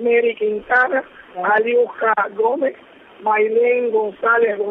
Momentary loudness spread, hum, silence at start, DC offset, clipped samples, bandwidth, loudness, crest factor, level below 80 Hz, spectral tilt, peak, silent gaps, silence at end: 8 LU; none; 0 s; under 0.1%; under 0.1%; 3.9 kHz; -18 LUFS; 14 dB; -64 dBFS; -7 dB/octave; -4 dBFS; none; 0 s